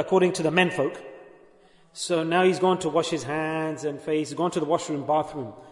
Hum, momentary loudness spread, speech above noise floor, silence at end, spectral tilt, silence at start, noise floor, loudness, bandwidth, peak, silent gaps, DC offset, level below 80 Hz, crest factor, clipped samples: none; 12 LU; 31 dB; 0 s; -5 dB/octave; 0 s; -56 dBFS; -25 LUFS; 11 kHz; -6 dBFS; none; under 0.1%; -68 dBFS; 20 dB; under 0.1%